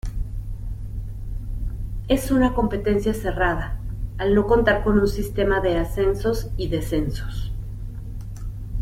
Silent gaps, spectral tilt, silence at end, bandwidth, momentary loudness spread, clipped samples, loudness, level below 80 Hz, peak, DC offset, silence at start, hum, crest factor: none; -6.5 dB/octave; 0 s; 16 kHz; 15 LU; under 0.1%; -23 LUFS; -30 dBFS; -2 dBFS; under 0.1%; 0.05 s; none; 20 dB